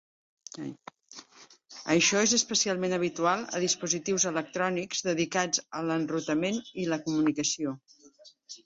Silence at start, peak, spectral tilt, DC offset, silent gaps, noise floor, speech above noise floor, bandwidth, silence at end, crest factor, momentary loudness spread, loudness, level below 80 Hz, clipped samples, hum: 0.55 s; -10 dBFS; -3 dB/octave; under 0.1%; none; -57 dBFS; 28 dB; 8 kHz; 0.1 s; 20 dB; 20 LU; -28 LUFS; -70 dBFS; under 0.1%; none